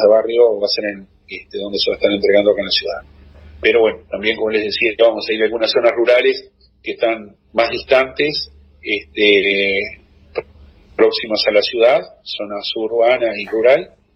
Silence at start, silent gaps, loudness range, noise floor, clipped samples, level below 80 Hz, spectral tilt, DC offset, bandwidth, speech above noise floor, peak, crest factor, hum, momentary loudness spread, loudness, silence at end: 0 s; none; 2 LU; -44 dBFS; under 0.1%; -48 dBFS; -5.5 dB/octave; under 0.1%; 6.2 kHz; 29 dB; 0 dBFS; 16 dB; none; 15 LU; -16 LUFS; 0.3 s